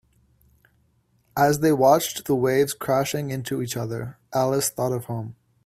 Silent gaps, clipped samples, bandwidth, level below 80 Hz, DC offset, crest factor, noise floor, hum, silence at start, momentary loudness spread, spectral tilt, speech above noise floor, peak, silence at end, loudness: none; under 0.1%; 16 kHz; -58 dBFS; under 0.1%; 20 dB; -65 dBFS; none; 1.35 s; 14 LU; -5 dB/octave; 42 dB; -4 dBFS; 0.35 s; -23 LUFS